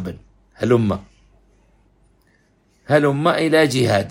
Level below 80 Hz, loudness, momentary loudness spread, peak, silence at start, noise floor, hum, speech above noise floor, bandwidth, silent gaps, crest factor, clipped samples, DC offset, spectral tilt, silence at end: -52 dBFS; -18 LUFS; 13 LU; 0 dBFS; 0 s; -59 dBFS; none; 43 dB; 16 kHz; none; 20 dB; under 0.1%; under 0.1%; -6 dB/octave; 0 s